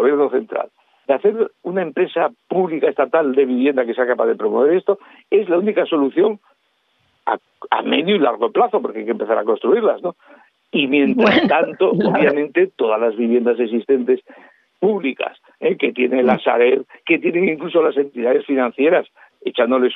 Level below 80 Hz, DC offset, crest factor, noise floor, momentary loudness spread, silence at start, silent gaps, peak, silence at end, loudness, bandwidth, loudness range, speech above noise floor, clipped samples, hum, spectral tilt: -68 dBFS; under 0.1%; 16 dB; -64 dBFS; 8 LU; 0 s; none; -2 dBFS; 0 s; -18 LUFS; 5.8 kHz; 3 LU; 47 dB; under 0.1%; none; -8 dB/octave